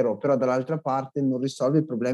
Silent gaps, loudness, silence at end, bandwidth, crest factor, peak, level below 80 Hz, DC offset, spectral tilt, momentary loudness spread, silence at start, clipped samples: none; -25 LUFS; 0 s; 11.5 kHz; 14 dB; -10 dBFS; -86 dBFS; under 0.1%; -7.5 dB/octave; 4 LU; 0 s; under 0.1%